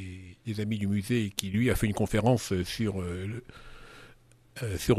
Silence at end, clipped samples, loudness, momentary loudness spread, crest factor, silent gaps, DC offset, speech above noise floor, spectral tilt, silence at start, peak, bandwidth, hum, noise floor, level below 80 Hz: 0 s; under 0.1%; -30 LUFS; 23 LU; 26 dB; none; under 0.1%; 29 dB; -6 dB/octave; 0 s; -4 dBFS; 14 kHz; none; -57 dBFS; -46 dBFS